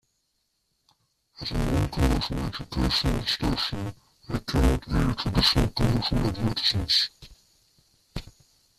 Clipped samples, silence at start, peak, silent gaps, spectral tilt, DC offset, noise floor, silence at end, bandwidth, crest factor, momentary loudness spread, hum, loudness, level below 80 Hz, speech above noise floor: under 0.1%; 1.4 s; -8 dBFS; none; -5 dB/octave; under 0.1%; -74 dBFS; 0.5 s; 14.5 kHz; 20 dB; 14 LU; none; -25 LUFS; -34 dBFS; 50 dB